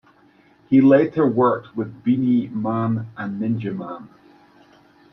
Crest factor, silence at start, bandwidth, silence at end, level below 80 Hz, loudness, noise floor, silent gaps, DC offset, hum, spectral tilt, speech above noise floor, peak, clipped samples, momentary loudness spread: 18 dB; 0.7 s; 5.4 kHz; 1.05 s; -64 dBFS; -20 LUFS; -55 dBFS; none; under 0.1%; none; -10.5 dB/octave; 35 dB; -2 dBFS; under 0.1%; 15 LU